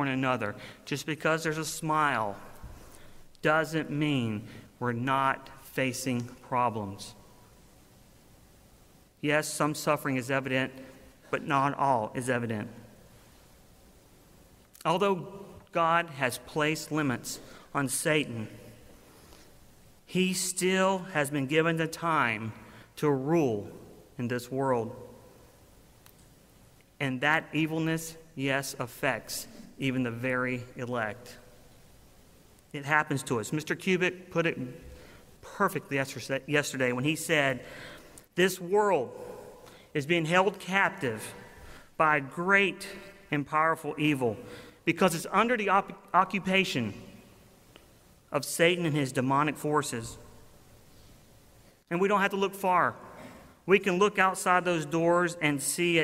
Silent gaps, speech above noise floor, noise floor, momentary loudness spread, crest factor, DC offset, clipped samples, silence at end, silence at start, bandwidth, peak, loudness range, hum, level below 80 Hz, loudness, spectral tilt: none; 30 dB; -58 dBFS; 17 LU; 22 dB; under 0.1%; under 0.1%; 0 s; 0 s; 16 kHz; -8 dBFS; 6 LU; none; -62 dBFS; -29 LUFS; -4.5 dB/octave